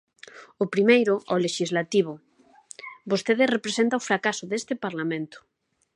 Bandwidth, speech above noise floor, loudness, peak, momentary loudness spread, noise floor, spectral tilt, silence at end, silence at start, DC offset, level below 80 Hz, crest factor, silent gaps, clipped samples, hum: 11 kHz; 27 dB; -24 LUFS; -6 dBFS; 19 LU; -51 dBFS; -4.5 dB/octave; 0.55 s; 0.35 s; under 0.1%; -76 dBFS; 20 dB; none; under 0.1%; none